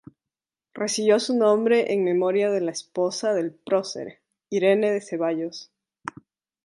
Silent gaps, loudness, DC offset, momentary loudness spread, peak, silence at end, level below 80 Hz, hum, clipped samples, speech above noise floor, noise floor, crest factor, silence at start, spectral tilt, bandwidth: none; -23 LUFS; under 0.1%; 17 LU; -6 dBFS; 0.55 s; -76 dBFS; none; under 0.1%; 67 dB; -90 dBFS; 18 dB; 0.75 s; -4.5 dB/octave; 11.5 kHz